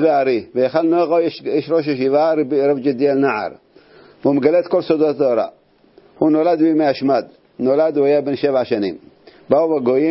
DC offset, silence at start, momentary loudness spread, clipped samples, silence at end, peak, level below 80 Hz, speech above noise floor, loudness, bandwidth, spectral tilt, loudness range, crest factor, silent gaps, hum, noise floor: under 0.1%; 0 s; 7 LU; under 0.1%; 0 s; 0 dBFS; -62 dBFS; 35 dB; -17 LUFS; 5.8 kHz; -10.5 dB/octave; 1 LU; 16 dB; none; none; -50 dBFS